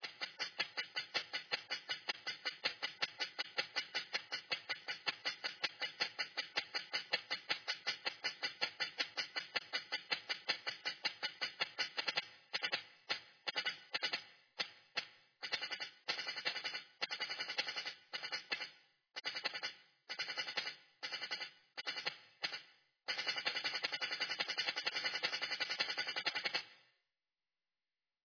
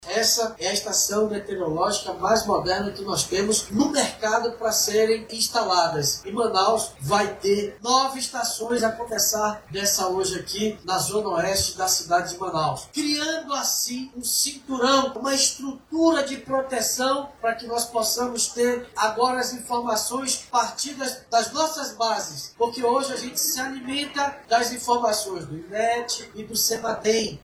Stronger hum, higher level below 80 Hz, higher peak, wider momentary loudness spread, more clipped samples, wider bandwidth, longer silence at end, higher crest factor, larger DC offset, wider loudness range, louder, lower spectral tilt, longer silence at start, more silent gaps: neither; second, under -90 dBFS vs -54 dBFS; second, -20 dBFS vs -6 dBFS; about the same, 7 LU vs 6 LU; neither; second, 5.4 kHz vs 16.5 kHz; first, 1.45 s vs 0.05 s; first, 24 dB vs 18 dB; neither; about the same, 4 LU vs 2 LU; second, -40 LUFS vs -23 LUFS; second, 0 dB/octave vs -2 dB/octave; about the same, 0 s vs 0 s; neither